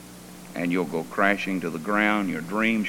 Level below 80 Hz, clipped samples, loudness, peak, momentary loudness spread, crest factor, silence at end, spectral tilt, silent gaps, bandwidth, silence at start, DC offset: -60 dBFS; under 0.1%; -25 LUFS; -6 dBFS; 12 LU; 18 dB; 0 s; -5.5 dB/octave; none; 17.5 kHz; 0 s; under 0.1%